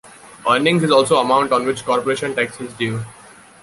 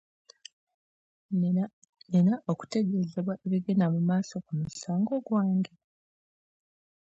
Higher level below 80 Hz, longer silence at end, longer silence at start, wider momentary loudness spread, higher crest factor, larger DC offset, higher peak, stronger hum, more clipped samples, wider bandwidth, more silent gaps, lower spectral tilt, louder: first, -58 dBFS vs -70 dBFS; second, 0.5 s vs 1.45 s; second, 0.05 s vs 1.3 s; about the same, 10 LU vs 9 LU; about the same, 16 dB vs 16 dB; neither; first, -2 dBFS vs -14 dBFS; neither; neither; first, 11.5 kHz vs 8 kHz; second, none vs 1.73-1.82 s; second, -4.5 dB/octave vs -8 dB/octave; first, -17 LUFS vs -29 LUFS